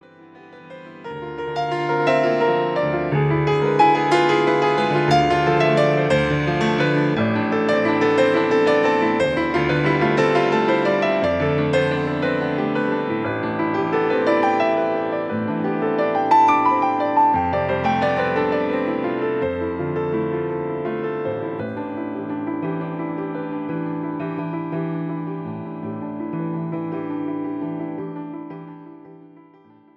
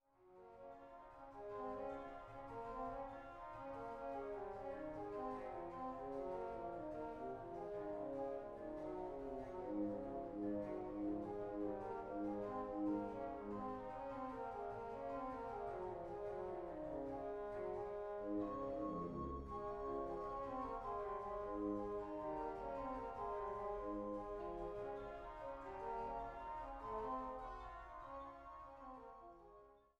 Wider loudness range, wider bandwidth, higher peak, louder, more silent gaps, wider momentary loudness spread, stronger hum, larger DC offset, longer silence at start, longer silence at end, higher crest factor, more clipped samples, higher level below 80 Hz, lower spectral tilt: first, 9 LU vs 4 LU; first, 10 kHz vs 9 kHz; first, -4 dBFS vs -32 dBFS; first, -20 LUFS vs -48 LUFS; neither; about the same, 11 LU vs 9 LU; neither; neither; about the same, 0.2 s vs 0.2 s; first, 0.8 s vs 0.2 s; about the same, 16 dB vs 16 dB; neither; first, -50 dBFS vs -64 dBFS; second, -7 dB/octave vs -8.5 dB/octave